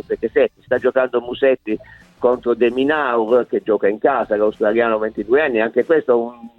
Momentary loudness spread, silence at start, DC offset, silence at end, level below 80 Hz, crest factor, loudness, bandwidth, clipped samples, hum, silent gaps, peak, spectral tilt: 4 LU; 0.1 s; under 0.1%; 0.1 s; -54 dBFS; 16 dB; -18 LUFS; 4.4 kHz; under 0.1%; none; none; -2 dBFS; -7.5 dB/octave